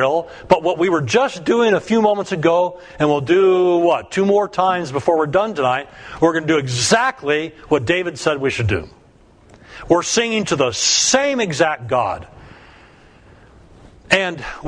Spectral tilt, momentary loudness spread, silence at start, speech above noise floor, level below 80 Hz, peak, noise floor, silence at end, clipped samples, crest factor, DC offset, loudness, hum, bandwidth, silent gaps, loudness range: -4 dB/octave; 6 LU; 0 s; 32 dB; -48 dBFS; 0 dBFS; -49 dBFS; 0 s; under 0.1%; 18 dB; under 0.1%; -17 LUFS; none; 10.5 kHz; none; 4 LU